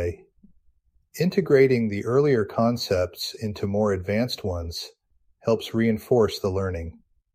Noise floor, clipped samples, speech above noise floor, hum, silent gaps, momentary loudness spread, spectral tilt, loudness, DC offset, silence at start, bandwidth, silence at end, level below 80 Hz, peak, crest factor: -63 dBFS; under 0.1%; 40 dB; none; none; 13 LU; -6.5 dB/octave; -24 LUFS; under 0.1%; 0 s; 15.5 kHz; 0.4 s; -48 dBFS; -6 dBFS; 18 dB